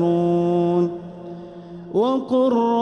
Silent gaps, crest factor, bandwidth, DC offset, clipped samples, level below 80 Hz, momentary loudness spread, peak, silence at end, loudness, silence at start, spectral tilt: none; 12 dB; 6.6 kHz; under 0.1%; under 0.1%; -58 dBFS; 18 LU; -8 dBFS; 0 s; -20 LUFS; 0 s; -9 dB/octave